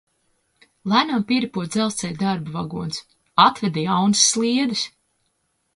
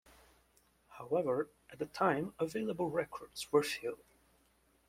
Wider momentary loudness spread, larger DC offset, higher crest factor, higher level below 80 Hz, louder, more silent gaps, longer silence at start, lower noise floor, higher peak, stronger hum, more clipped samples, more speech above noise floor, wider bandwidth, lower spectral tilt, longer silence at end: about the same, 13 LU vs 12 LU; neither; about the same, 22 dB vs 22 dB; first, -60 dBFS vs -72 dBFS; first, -20 LUFS vs -36 LUFS; neither; about the same, 0.85 s vs 0.9 s; about the same, -70 dBFS vs -72 dBFS; first, 0 dBFS vs -16 dBFS; neither; neither; first, 50 dB vs 36 dB; second, 11.5 kHz vs 16 kHz; second, -3.5 dB/octave vs -5 dB/octave; about the same, 0.85 s vs 0.95 s